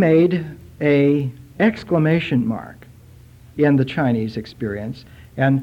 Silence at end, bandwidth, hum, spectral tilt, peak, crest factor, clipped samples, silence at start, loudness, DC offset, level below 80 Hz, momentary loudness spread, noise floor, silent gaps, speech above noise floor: 0 s; 8.4 kHz; none; -9 dB/octave; -4 dBFS; 16 dB; under 0.1%; 0 s; -19 LUFS; under 0.1%; -50 dBFS; 17 LU; -45 dBFS; none; 27 dB